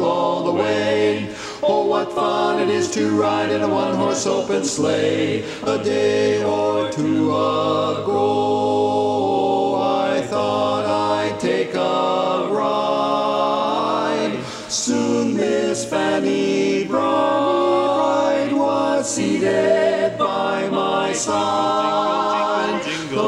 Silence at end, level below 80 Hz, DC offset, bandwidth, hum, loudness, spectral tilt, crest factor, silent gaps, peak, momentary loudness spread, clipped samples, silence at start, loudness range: 0 s; -60 dBFS; under 0.1%; 12 kHz; none; -19 LUFS; -4.5 dB/octave; 14 dB; none; -6 dBFS; 3 LU; under 0.1%; 0 s; 2 LU